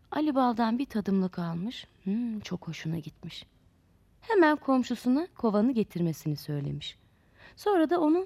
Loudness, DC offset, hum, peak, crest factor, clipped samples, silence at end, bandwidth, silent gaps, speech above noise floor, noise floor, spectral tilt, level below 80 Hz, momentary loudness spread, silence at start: -29 LUFS; under 0.1%; none; -12 dBFS; 18 dB; under 0.1%; 0 s; 15 kHz; none; 35 dB; -63 dBFS; -7 dB/octave; -62 dBFS; 14 LU; 0.1 s